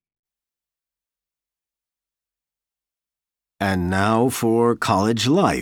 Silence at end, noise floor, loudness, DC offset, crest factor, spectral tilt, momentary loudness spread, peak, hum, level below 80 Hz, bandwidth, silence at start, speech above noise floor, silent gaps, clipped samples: 0 s; under -90 dBFS; -19 LUFS; under 0.1%; 20 dB; -5.5 dB/octave; 5 LU; -4 dBFS; none; -54 dBFS; 18.5 kHz; 3.6 s; over 71 dB; none; under 0.1%